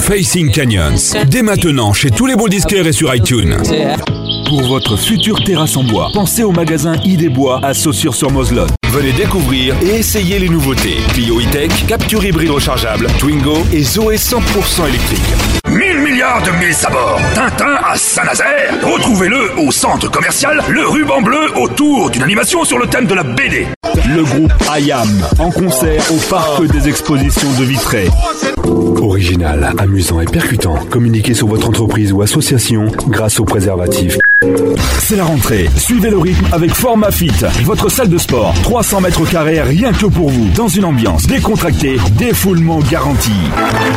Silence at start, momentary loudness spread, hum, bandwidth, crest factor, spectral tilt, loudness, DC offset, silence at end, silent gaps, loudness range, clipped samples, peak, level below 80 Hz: 0 s; 2 LU; none; 16.5 kHz; 8 dB; -4.5 dB/octave; -11 LUFS; under 0.1%; 0 s; 23.76-23.81 s; 1 LU; under 0.1%; -2 dBFS; -22 dBFS